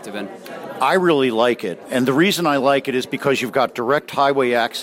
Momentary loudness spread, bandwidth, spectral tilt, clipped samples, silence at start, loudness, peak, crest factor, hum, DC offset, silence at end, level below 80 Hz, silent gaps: 12 LU; 16.5 kHz; -4.5 dB/octave; under 0.1%; 0 s; -18 LUFS; -4 dBFS; 14 dB; none; under 0.1%; 0 s; -66 dBFS; none